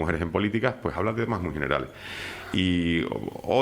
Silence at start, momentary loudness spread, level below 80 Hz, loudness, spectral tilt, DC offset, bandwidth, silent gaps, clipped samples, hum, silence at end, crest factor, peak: 0 s; 10 LU; -48 dBFS; -27 LUFS; -6.5 dB/octave; under 0.1%; 16 kHz; none; under 0.1%; none; 0 s; 20 dB; -8 dBFS